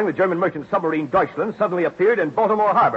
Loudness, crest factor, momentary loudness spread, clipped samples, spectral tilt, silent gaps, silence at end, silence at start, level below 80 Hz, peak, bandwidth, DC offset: -20 LUFS; 12 dB; 5 LU; under 0.1%; -8 dB/octave; none; 0 s; 0 s; -58 dBFS; -6 dBFS; 7.6 kHz; under 0.1%